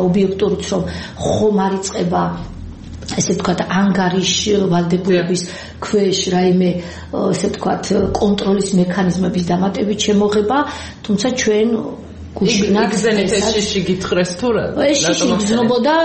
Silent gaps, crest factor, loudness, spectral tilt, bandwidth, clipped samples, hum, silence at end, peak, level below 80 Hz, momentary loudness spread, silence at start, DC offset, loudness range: none; 12 dB; -16 LUFS; -5 dB/octave; 8.8 kHz; under 0.1%; none; 0 s; -4 dBFS; -40 dBFS; 9 LU; 0 s; under 0.1%; 2 LU